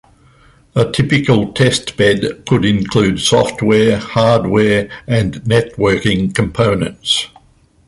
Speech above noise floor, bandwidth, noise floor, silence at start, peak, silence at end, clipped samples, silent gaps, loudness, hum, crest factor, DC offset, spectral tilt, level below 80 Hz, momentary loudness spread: 37 dB; 11.5 kHz; -50 dBFS; 0.75 s; -2 dBFS; 0.6 s; under 0.1%; none; -14 LUFS; none; 14 dB; under 0.1%; -5.5 dB/octave; -38 dBFS; 5 LU